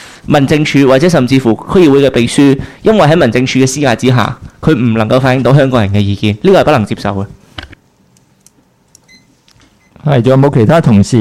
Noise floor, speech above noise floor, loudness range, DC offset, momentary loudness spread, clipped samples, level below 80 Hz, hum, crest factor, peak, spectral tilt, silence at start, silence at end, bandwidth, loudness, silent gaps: -49 dBFS; 41 dB; 9 LU; under 0.1%; 9 LU; under 0.1%; -38 dBFS; none; 10 dB; 0 dBFS; -6.5 dB/octave; 0 s; 0 s; 14.5 kHz; -9 LUFS; none